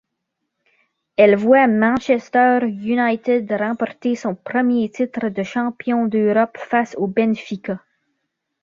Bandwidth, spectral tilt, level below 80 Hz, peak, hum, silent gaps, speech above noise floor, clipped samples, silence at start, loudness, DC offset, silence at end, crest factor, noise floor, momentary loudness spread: 7.2 kHz; -7 dB/octave; -62 dBFS; -2 dBFS; none; none; 59 dB; under 0.1%; 1.2 s; -18 LUFS; under 0.1%; 0.85 s; 18 dB; -77 dBFS; 10 LU